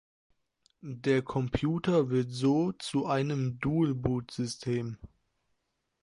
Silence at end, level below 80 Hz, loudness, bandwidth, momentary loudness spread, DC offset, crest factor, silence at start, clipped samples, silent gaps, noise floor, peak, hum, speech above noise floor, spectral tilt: 0.95 s; -54 dBFS; -30 LUFS; 11.5 kHz; 8 LU; under 0.1%; 18 dB; 0.85 s; under 0.1%; none; -80 dBFS; -12 dBFS; none; 50 dB; -7 dB/octave